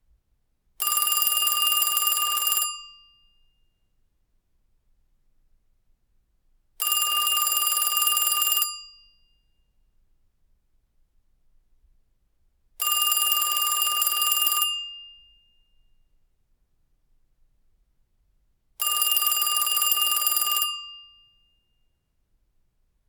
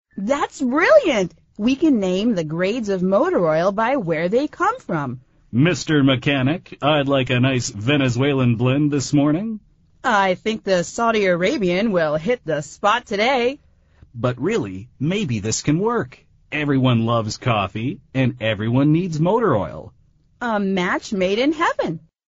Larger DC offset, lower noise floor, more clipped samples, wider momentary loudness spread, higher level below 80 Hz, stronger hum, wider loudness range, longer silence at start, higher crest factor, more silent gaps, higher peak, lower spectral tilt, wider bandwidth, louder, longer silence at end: neither; first, -70 dBFS vs -51 dBFS; neither; about the same, 8 LU vs 8 LU; second, -66 dBFS vs -50 dBFS; neither; first, 8 LU vs 3 LU; first, 0.8 s vs 0.15 s; first, 24 dB vs 18 dB; neither; about the same, -4 dBFS vs -2 dBFS; second, 4.5 dB/octave vs -5 dB/octave; first, over 20 kHz vs 8 kHz; about the same, -21 LUFS vs -20 LUFS; first, 2.05 s vs 0.3 s